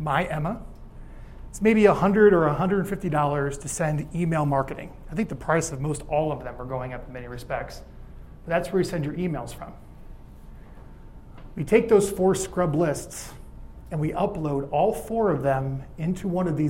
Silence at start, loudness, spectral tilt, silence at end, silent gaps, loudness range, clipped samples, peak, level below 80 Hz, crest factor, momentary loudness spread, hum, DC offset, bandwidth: 0 s; -24 LUFS; -6.5 dB/octave; 0 s; none; 9 LU; under 0.1%; -4 dBFS; -44 dBFS; 22 dB; 19 LU; none; under 0.1%; 16 kHz